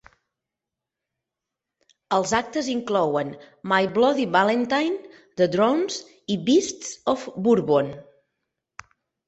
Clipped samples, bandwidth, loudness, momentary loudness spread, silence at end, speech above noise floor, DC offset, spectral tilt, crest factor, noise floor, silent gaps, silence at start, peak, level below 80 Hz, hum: under 0.1%; 8.2 kHz; -23 LUFS; 12 LU; 1.25 s; 64 dB; under 0.1%; -4.5 dB/octave; 20 dB; -86 dBFS; none; 2.1 s; -4 dBFS; -64 dBFS; none